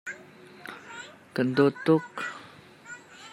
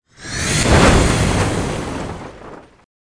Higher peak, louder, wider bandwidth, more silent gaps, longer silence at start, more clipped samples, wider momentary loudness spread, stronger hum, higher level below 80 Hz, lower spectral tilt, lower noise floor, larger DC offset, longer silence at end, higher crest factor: second, -8 dBFS vs 0 dBFS; second, -26 LUFS vs -16 LUFS; first, 13.5 kHz vs 10.5 kHz; neither; second, 0.05 s vs 0.2 s; neither; about the same, 21 LU vs 20 LU; neither; second, -74 dBFS vs -24 dBFS; first, -6.5 dB/octave vs -4.5 dB/octave; first, -50 dBFS vs -38 dBFS; neither; second, 0 s vs 0.6 s; about the same, 22 dB vs 18 dB